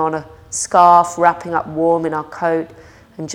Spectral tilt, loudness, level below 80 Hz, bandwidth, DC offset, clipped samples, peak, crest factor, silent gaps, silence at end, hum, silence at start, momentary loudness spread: -4.5 dB/octave; -15 LUFS; -54 dBFS; 15.5 kHz; under 0.1%; under 0.1%; 0 dBFS; 16 dB; none; 0 s; none; 0 s; 16 LU